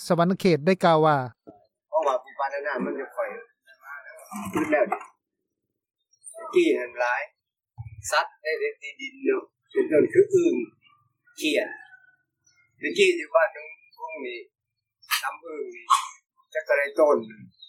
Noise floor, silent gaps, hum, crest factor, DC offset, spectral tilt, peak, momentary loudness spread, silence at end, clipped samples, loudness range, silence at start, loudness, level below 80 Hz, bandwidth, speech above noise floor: -83 dBFS; none; none; 20 dB; under 0.1%; -5 dB/octave; -6 dBFS; 20 LU; 0.05 s; under 0.1%; 5 LU; 0 s; -25 LUFS; -68 dBFS; 16.5 kHz; 58 dB